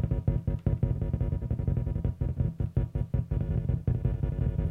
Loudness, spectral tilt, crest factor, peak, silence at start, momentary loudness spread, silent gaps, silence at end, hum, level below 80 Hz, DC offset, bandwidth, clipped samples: -31 LUFS; -11 dB/octave; 14 dB; -14 dBFS; 0 s; 2 LU; none; 0 s; none; -34 dBFS; under 0.1%; 3.6 kHz; under 0.1%